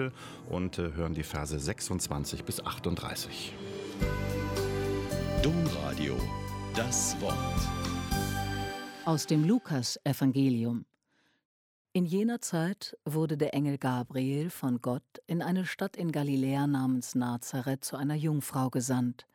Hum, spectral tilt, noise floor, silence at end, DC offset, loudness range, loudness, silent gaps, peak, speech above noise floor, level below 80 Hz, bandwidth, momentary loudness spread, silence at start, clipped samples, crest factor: none; -5 dB/octave; -73 dBFS; 0.1 s; under 0.1%; 4 LU; -32 LUFS; 11.45-11.85 s; -14 dBFS; 42 dB; -46 dBFS; 17 kHz; 8 LU; 0 s; under 0.1%; 16 dB